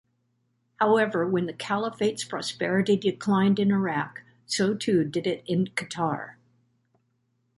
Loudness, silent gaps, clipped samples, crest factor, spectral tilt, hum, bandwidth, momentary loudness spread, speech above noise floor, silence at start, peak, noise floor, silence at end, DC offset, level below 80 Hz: -26 LUFS; none; under 0.1%; 18 dB; -5.5 dB/octave; none; 11.5 kHz; 9 LU; 47 dB; 0.8 s; -8 dBFS; -72 dBFS; 1.25 s; under 0.1%; -68 dBFS